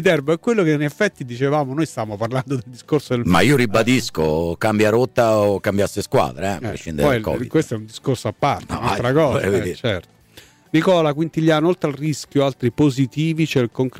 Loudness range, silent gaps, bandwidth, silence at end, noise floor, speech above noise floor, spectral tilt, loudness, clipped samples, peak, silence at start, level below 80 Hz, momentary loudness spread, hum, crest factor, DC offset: 4 LU; none; 16 kHz; 0 s; -48 dBFS; 29 dB; -6 dB/octave; -19 LUFS; under 0.1%; -6 dBFS; 0 s; -46 dBFS; 8 LU; none; 12 dB; under 0.1%